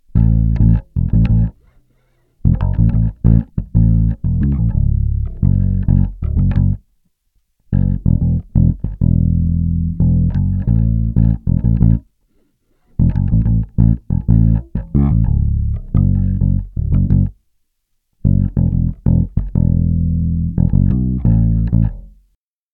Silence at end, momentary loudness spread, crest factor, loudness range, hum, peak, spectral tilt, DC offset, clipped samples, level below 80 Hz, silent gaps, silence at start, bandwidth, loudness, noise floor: 0.65 s; 5 LU; 14 dB; 2 LU; none; -2 dBFS; -13 dB/octave; under 0.1%; under 0.1%; -20 dBFS; none; 0.15 s; 2.9 kHz; -16 LUFS; -67 dBFS